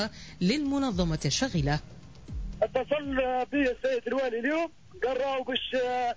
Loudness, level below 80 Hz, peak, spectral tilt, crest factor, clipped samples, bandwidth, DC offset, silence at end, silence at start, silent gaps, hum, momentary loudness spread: -29 LUFS; -44 dBFS; -14 dBFS; -5 dB/octave; 14 dB; under 0.1%; 8 kHz; 0.2%; 0 s; 0 s; none; none; 7 LU